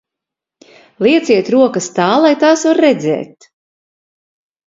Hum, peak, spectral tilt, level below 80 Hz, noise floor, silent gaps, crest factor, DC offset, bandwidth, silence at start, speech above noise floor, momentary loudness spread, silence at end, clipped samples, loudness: none; 0 dBFS; -4.5 dB/octave; -62 dBFS; -83 dBFS; none; 14 dB; under 0.1%; 7.8 kHz; 1 s; 72 dB; 7 LU; 1.4 s; under 0.1%; -12 LUFS